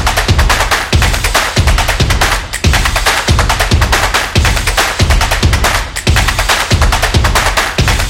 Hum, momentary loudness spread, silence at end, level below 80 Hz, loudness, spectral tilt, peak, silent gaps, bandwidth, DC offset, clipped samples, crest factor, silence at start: none; 2 LU; 0 s; -14 dBFS; -11 LUFS; -3.5 dB/octave; 0 dBFS; none; 17 kHz; under 0.1%; under 0.1%; 10 dB; 0 s